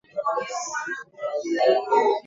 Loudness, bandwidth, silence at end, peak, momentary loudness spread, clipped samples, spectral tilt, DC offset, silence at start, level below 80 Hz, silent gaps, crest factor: -25 LUFS; 7.8 kHz; 0.05 s; -6 dBFS; 11 LU; under 0.1%; -2 dB/octave; under 0.1%; 0.15 s; -76 dBFS; none; 18 dB